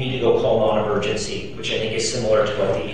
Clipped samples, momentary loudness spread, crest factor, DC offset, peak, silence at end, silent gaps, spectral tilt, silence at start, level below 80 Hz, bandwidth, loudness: under 0.1%; 7 LU; 14 dB; 2%; -6 dBFS; 0 s; none; -4.5 dB/octave; 0 s; -42 dBFS; 10.5 kHz; -21 LUFS